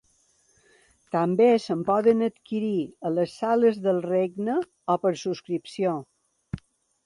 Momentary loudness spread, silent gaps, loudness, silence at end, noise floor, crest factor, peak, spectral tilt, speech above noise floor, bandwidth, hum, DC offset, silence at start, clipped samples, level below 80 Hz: 11 LU; none; -25 LUFS; 0.5 s; -65 dBFS; 18 dB; -8 dBFS; -7 dB/octave; 41 dB; 11 kHz; none; under 0.1%; 1.15 s; under 0.1%; -62 dBFS